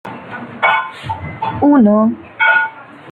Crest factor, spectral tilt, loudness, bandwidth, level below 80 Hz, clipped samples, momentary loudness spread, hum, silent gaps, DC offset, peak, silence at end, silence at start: 14 dB; -7.5 dB/octave; -14 LUFS; 4.6 kHz; -54 dBFS; under 0.1%; 16 LU; none; none; under 0.1%; -2 dBFS; 0 s; 0.05 s